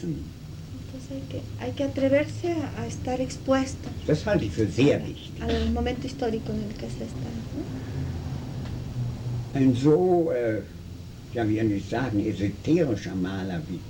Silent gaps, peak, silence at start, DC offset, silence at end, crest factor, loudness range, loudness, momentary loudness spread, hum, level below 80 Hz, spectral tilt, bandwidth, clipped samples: none; -10 dBFS; 0 s; under 0.1%; 0 s; 18 dB; 5 LU; -27 LUFS; 13 LU; none; -42 dBFS; -7 dB/octave; 18.5 kHz; under 0.1%